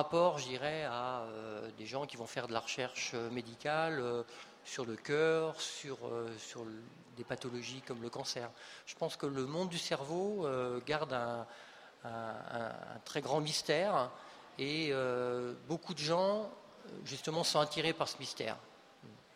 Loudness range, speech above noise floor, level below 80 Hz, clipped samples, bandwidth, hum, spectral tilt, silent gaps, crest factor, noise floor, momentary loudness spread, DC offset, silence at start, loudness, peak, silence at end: 5 LU; 20 dB; -76 dBFS; under 0.1%; 15.5 kHz; none; -4 dB/octave; none; 22 dB; -58 dBFS; 16 LU; under 0.1%; 0 s; -38 LUFS; -16 dBFS; 0 s